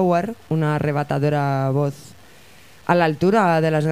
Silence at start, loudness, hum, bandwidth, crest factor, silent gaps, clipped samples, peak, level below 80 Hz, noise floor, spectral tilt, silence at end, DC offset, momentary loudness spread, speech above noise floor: 0 s; -20 LUFS; none; 15 kHz; 16 dB; none; under 0.1%; -4 dBFS; -54 dBFS; -48 dBFS; -7.5 dB/octave; 0 s; 0.4%; 8 LU; 29 dB